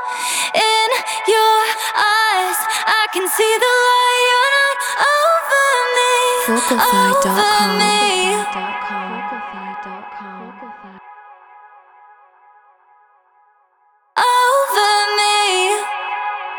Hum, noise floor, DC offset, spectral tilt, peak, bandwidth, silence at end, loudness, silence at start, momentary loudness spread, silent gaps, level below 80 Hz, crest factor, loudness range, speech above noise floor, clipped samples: none; -58 dBFS; under 0.1%; -1.5 dB/octave; 0 dBFS; over 20 kHz; 0 s; -15 LUFS; 0 s; 15 LU; none; -62 dBFS; 16 dB; 15 LU; 43 dB; under 0.1%